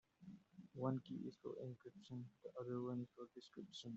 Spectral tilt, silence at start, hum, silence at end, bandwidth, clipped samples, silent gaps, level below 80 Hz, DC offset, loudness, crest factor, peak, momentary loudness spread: -7.5 dB/octave; 0.2 s; none; 0 s; 7.6 kHz; under 0.1%; none; -86 dBFS; under 0.1%; -51 LUFS; 20 dB; -30 dBFS; 16 LU